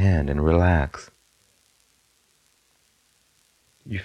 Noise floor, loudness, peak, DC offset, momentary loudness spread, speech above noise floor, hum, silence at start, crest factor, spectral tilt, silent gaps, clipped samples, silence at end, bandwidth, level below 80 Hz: -64 dBFS; -22 LUFS; -6 dBFS; under 0.1%; 15 LU; 44 dB; none; 0 s; 20 dB; -8 dB/octave; none; under 0.1%; 0 s; 8.6 kHz; -34 dBFS